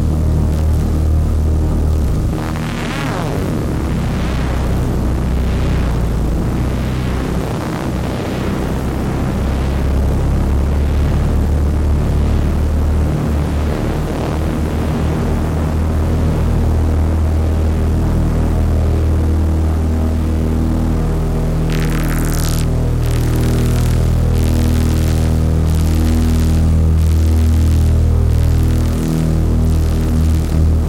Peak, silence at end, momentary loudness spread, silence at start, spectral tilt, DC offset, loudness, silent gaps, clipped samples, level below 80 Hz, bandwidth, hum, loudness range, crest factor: -4 dBFS; 0 s; 5 LU; 0 s; -7 dB/octave; under 0.1%; -16 LUFS; none; under 0.1%; -18 dBFS; 16 kHz; none; 4 LU; 10 dB